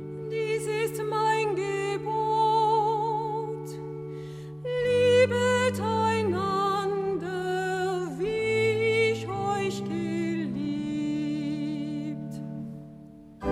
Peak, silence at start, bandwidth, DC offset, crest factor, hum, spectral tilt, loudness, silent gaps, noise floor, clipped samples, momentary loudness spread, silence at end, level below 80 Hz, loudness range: -10 dBFS; 0 s; 16 kHz; under 0.1%; 18 dB; none; -5.5 dB/octave; -27 LUFS; none; -47 dBFS; under 0.1%; 14 LU; 0 s; -60 dBFS; 5 LU